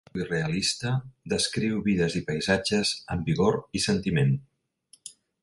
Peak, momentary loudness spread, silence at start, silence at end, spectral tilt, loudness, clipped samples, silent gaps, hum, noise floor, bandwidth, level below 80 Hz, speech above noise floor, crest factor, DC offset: -8 dBFS; 8 LU; 0.15 s; 0.3 s; -5 dB/octave; -26 LUFS; under 0.1%; none; none; -61 dBFS; 11.5 kHz; -50 dBFS; 35 dB; 18 dB; under 0.1%